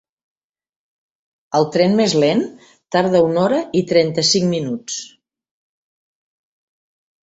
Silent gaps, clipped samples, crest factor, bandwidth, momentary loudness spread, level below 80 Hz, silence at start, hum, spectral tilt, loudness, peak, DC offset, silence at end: none; under 0.1%; 18 dB; 8.2 kHz; 10 LU; -60 dBFS; 1.5 s; none; -4.5 dB/octave; -17 LUFS; -2 dBFS; under 0.1%; 2.15 s